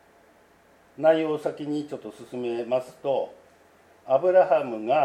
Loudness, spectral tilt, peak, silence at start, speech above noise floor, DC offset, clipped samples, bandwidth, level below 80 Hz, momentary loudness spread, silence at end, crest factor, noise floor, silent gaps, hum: -25 LUFS; -6.5 dB/octave; -8 dBFS; 1 s; 34 dB; under 0.1%; under 0.1%; 11.5 kHz; -74 dBFS; 16 LU; 0 s; 18 dB; -58 dBFS; none; none